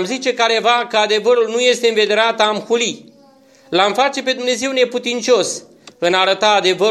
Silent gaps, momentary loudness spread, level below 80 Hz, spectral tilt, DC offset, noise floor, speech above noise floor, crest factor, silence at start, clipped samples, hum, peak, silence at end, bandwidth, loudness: none; 6 LU; -70 dBFS; -2 dB/octave; under 0.1%; -48 dBFS; 33 dB; 16 dB; 0 s; under 0.1%; none; 0 dBFS; 0 s; 12.5 kHz; -15 LUFS